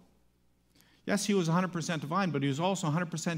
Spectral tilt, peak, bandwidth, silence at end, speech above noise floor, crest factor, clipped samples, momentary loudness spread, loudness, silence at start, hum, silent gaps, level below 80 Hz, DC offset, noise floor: -5 dB/octave; -14 dBFS; 16 kHz; 0 s; 38 dB; 18 dB; under 0.1%; 5 LU; -31 LUFS; 1.05 s; 60 Hz at -50 dBFS; none; -72 dBFS; under 0.1%; -68 dBFS